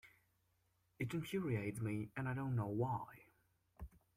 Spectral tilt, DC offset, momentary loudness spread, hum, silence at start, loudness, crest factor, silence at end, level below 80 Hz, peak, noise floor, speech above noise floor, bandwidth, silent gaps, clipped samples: -7.5 dB/octave; under 0.1%; 17 LU; none; 0.05 s; -42 LUFS; 16 dB; 0.3 s; -66 dBFS; -28 dBFS; -80 dBFS; 39 dB; 15.5 kHz; none; under 0.1%